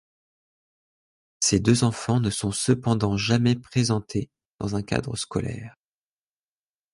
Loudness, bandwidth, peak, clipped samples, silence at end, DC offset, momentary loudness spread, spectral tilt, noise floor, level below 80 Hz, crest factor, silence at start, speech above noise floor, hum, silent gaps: -24 LUFS; 11.5 kHz; -6 dBFS; under 0.1%; 1.25 s; under 0.1%; 11 LU; -5 dB/octave; under -90 dBFS; -48 dBFS; 20 dB; 1.4 s; over 66 dB; none; 4.51-4.55 s